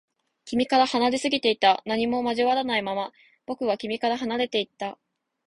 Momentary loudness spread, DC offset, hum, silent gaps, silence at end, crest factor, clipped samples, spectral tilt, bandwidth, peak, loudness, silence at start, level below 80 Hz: 11 LU; under 0.1%; none; none; 0.55 s; 20 dB; under 0.1%; -3.5 dB/octave; 11.5 kHz; -6 dBFS; -24 LUFS; 0.45 s; -64 dBFS